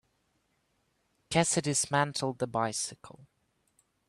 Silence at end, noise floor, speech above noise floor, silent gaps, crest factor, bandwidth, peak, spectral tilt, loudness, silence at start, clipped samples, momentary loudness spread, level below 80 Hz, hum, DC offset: 0.85 s; -75 dBFS; 44 dB; none; 22 dB; 13 kHz; -12 dBFS; -3.5 dB/octave; -30 LUFS; 1.3 s; under 0.1%; 6 LU; -66 dBFS; none; under 0.1%